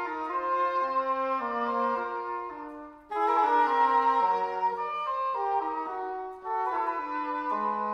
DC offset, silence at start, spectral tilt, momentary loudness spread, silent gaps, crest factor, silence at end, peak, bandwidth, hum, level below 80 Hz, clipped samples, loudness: under 0.1%; 0 s; -5 dB/octave; 12 LU; none; 16 dB; 0 s; -12 dBFS; 7 kHz; none; -68 dBFS; under 0.1%; -28 LUFS